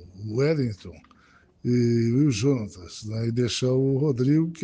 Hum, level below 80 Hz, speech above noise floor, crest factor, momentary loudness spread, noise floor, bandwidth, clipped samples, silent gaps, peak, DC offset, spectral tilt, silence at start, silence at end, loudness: none; -58 dBFS; 34 dB; 14 dB; 12 LU; -58 dBFS; 9.4 kHz; under 0.1%; none; -10 dBFS; under 0.1%; -7 dB/octave; 0 s; 0 s; -24 LUFS